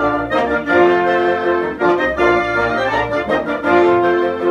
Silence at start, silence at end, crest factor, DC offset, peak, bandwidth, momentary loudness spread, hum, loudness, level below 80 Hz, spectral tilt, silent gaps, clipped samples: 0 s; 0 s; 14 dB; under 0.1%; 0 dBFS; 7.2 kHz; 5 LU; none; -15 LUFS; -42 dBFS; -6.5 dB/octave; none; under 0.1%